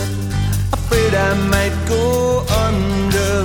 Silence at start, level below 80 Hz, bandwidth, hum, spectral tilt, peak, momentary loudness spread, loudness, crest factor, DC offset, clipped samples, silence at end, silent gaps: 0 s; -26 dBFS; 19 kHz; none; -5.5 dB/octave; -2 dBFS; 4 LU; -17 LUFS; 14 dB; under 0.1%; under 0.1%; 0 s; none